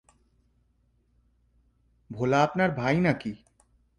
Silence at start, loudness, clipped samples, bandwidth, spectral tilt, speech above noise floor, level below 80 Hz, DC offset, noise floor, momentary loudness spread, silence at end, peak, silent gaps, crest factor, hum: 2.1 s; -26 LUFS; under 0.1%; 10.5 kHz; -7 dB/octave; 43 dB; -60 dBFS; under 0.1%; -68 dBFS; 18 LU; 0.65 s; -10 dBFS; none; 20 dB; 60 Hz at -55 dBFS